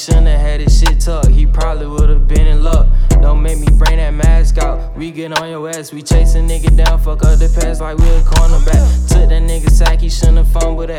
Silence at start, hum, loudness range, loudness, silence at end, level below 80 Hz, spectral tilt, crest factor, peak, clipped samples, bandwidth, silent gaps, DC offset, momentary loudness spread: 0 s; none; 2 LU; -13 LUFS; 0 s; -10 dBFS; -5.5 dB/octave; 8 dB; 0 dBFS; under 0.1%; 12 kHz; none; under 0.1%; 7 LU